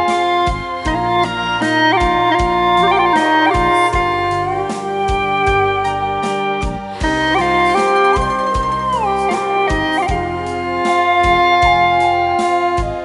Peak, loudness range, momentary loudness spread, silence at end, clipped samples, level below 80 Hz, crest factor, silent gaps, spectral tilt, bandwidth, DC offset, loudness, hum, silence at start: 0 dBFS; 3 LU; 7 LU; 0 s; under 0.1%; -30 dBFS; 14 dB; none; -5 dB/octave; 11.5 kHz; under 0.1%; -15 LUFS; none; 0 s